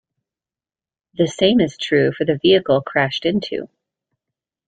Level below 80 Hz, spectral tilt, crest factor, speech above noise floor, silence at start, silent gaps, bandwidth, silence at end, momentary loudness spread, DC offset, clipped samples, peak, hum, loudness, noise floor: -56 dBFS; -5.5 dB/octave; 18 dB; over 73 dB; 1.2 s; none; 9.2 kHz; 1 s; 9 LU; under 0.1%; under 0.1%; -2 dBFS; none; -18 LUFS; under -90 dBFS